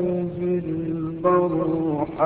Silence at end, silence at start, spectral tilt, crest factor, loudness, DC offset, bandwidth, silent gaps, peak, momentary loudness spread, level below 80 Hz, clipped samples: 0 s; 0 s; -13.5 dB/octave; 14 dB; -23 LUFS; under 0.1%; 4 kHz; none; -8 dBFS; 7 LU; -52 dBFS; under 0.1%